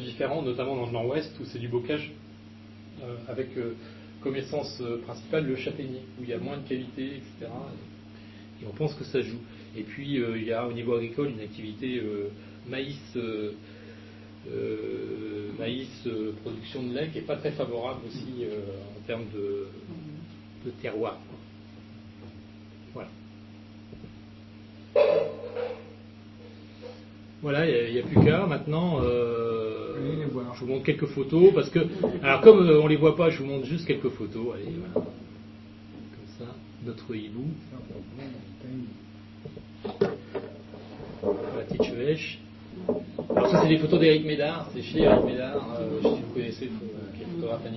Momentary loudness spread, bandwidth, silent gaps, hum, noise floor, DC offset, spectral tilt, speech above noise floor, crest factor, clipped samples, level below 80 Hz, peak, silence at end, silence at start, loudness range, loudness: 25 LU; 6 kHz; none; none; -47 dBFS; under 0.1%; -8 dB/octave; 21 dB; 26 dB; under 0.1%; -54 dBFS; -2 dBFS; 0 s; 0 s; 17 LU; -27 LUFS